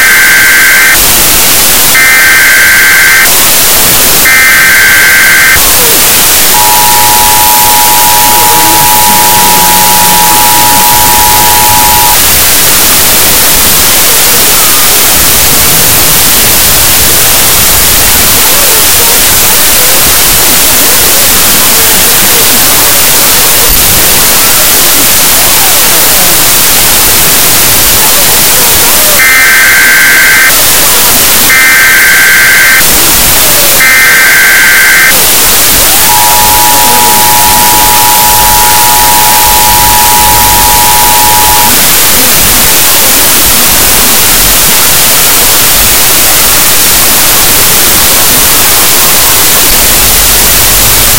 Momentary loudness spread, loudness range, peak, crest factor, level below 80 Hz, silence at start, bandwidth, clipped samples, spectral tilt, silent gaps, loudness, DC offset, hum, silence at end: 1 LU; 1 LU; 0 dBFS; 4 dB; -22 dBFS; 0 s; over 20 kHz; 20%; -0.5 dB/octave; none; -1 LUFS; 20%; none; 0 s